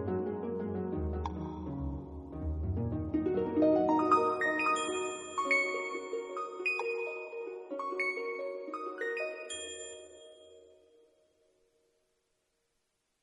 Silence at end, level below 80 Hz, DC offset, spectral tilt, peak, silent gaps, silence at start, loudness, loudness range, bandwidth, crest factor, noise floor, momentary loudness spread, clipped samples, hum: 2.55 s; -50 dBFS; under 0.1%; -5.5 dB/octave; -14 dBFS; none; 0 s; -33 LUFS; 12 LU; 11 kHz; 20 dB; -80 dBFS; 14 LU; under 0.1%; none